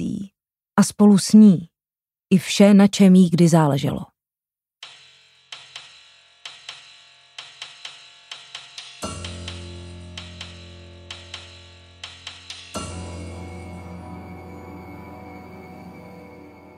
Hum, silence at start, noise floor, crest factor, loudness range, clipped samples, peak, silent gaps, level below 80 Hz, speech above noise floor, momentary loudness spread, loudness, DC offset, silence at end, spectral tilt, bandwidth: none; 0 s; under -90 dBFS; 20 dB; 24 LU; under 0.1%; -2 dBFS; none; -54 dBFS; over 76 dB; 27 LU; -16 LUFS; under 0.1%; 0.9 s; -6 dB/octave; 13.5 kHz